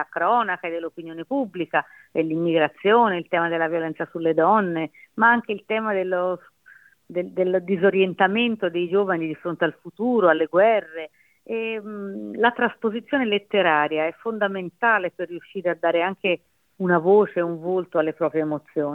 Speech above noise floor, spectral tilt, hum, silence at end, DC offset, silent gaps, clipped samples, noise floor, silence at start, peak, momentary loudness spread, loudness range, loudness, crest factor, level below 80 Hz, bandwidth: 31 dB; -8 dB/octave; none; 0 s; under 0.1%; none; under 0.1%; -53 dBFS; 0 s; -4 dBFS; 11 LU; 2 LU; -22 LUFS; 18 dB; -72 dBFS; 4.1 kHz